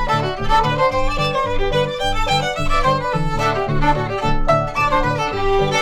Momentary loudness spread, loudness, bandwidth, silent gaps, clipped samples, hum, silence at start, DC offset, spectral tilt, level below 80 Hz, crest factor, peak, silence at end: 3 LU; -18 LUFS; 12 kHz; none; under 0.1%; none; 0 s; under 0.1%; -5 dB/octave; -24 dBFS; 14 dB; -4 dBFS; 0 s